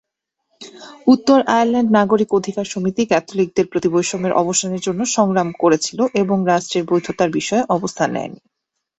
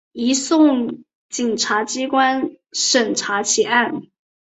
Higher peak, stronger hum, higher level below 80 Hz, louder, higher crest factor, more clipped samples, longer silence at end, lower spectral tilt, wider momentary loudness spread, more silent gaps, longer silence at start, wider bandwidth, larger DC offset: about the same, -2 dBFS vs -2 dBFS; neither; first, -58 dBFS vs -66 dBFS; about the same, -17 LUFS vs -18 LUFS; about the same, 16 dB vs 18 dB; neither; about the same, 0.65 s vs 0.55 s; first, -4.5 dB/octave vs -1.5 dB/octave; second, 7 LU vs 11 LU; second, none vs 1.15-1.29 s; first, 0.6 s vs 0.15 s; about the same, 8.4 kHz vs 8.2 kHz; neither